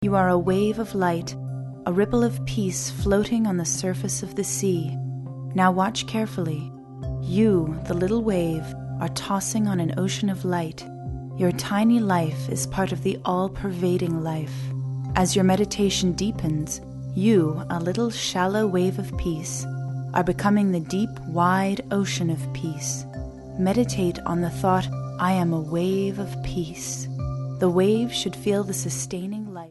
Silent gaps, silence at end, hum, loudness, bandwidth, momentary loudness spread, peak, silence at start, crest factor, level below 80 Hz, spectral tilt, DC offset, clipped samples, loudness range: none; 0 s; none; -24 LUFS; 12 kHz; 10 LU; -6 dBFS; 0 s; 18 dB; -44 dBFS; -5.5 dB/octave; under 0.1%; under 0.1%; 2 LU